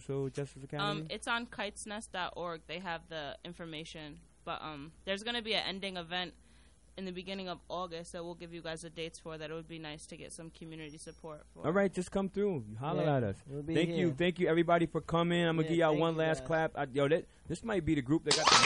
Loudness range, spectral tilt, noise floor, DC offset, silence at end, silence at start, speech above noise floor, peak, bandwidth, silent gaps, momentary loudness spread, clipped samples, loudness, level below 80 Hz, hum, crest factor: 12 LU; -4.5 dB/octave; -62 dBFS; under 0.1%; 0 s; 0 s; 28 dB; -12 dBFS; 11.5 kHz; none; 16 LU; under 0.1%; -35 LUFS; -60 dBFS; none; 24 dB